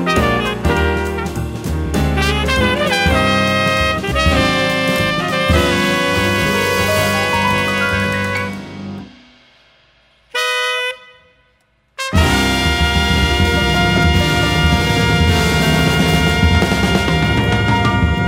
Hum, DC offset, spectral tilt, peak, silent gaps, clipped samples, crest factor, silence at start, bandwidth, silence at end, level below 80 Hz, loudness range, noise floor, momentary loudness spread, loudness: none; under 0.1%; -5 dB/octave; -2 dBFS; none; under 0.1%; 14 dB; 0 s; 16.5 kHz; 0 s; -24 dBFS; 7 LU; -58 dBFS; 7 LU; -15 LUFS